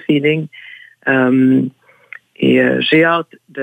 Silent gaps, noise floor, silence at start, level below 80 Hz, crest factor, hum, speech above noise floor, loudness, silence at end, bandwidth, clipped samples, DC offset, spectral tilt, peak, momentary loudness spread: none; -40 dBFS; 0.1 s; -60 dBFS; 14 dB; none; 26 dB; -14 LUFS; 0 s; 4.9 kHz; under 0.1%; under 0.1%; -8 dB/octave; 0 dBFS; 14 LU